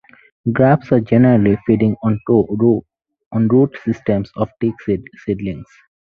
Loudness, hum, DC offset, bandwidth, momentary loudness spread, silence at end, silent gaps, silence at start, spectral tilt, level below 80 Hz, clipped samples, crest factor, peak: -16 LUFS; none; under 0.1%; 6.4 kHz; 11 LU; 0.5 s; 3.26-3.31 s; 0.45 s; -10.5 dB/octave; -46 dBFS; under 0.1%; 16 dB; 0 dBFS